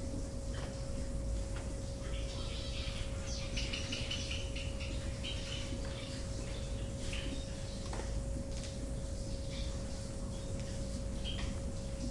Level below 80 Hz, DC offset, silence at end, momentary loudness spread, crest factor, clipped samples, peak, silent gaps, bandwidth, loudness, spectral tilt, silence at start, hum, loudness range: -42 dBFS; under 0.1%; 0 s; 4 LU; 14 dB; under 0.1%; -24 dBFS; none; 11.5 kHz; -41 LUFS; -4.5 dB/octave; 0 s; none; 2 LU